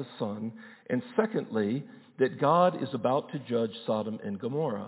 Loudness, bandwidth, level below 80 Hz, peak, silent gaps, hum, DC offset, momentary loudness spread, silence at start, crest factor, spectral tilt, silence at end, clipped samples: -30 LUFS; 4 kHz; -74 dBFS; -10 dBFS; none; none; under 0.1%; 11 LU; 0 s; 18 dB; -11 dB/octave; 0 s; under 0.1%